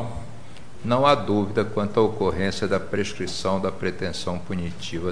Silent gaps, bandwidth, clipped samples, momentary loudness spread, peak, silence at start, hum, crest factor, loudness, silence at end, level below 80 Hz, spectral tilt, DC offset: none; 10.5 kHz; under 0.1%; 15 LU; -6 dBFS; 0 s; none; 20 dB; -24 LUFS; 0 s; -48 dBFS; -5.5 dB/octave; 2%